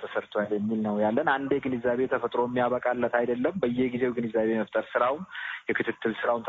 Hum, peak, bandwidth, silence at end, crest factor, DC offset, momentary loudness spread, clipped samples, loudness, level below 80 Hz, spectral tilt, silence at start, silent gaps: none; -10 dBFS; 7.2 kHz; 0 s; 18 dB; under 0.1%; 4 LU; under 0.1%; -28 LUFS; -64 dBFS; -4.5 dB/octave; 0 s; none